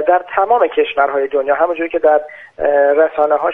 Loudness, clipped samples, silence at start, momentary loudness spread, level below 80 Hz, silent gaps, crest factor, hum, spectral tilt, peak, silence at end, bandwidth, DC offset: -14 LUFS; under 0.1%; 0 s; 4 LU; -52 dBFS; none; 14 dB; none; -6 dB/octave; 0 dBFS; 0 s; 3.8 kHz; under 0.1%